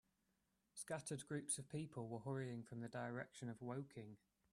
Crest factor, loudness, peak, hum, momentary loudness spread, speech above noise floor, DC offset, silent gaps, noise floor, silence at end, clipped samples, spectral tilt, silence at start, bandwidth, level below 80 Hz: 20 dB; -49 LUFS; -30 dBFS; none; 12 LU; 36 dB; under 0.1%; none; -86 dBFS; 0.35 s; under 0.1%; -5 dB/octave; 0.75 s; 13 kHz; -82 dBFS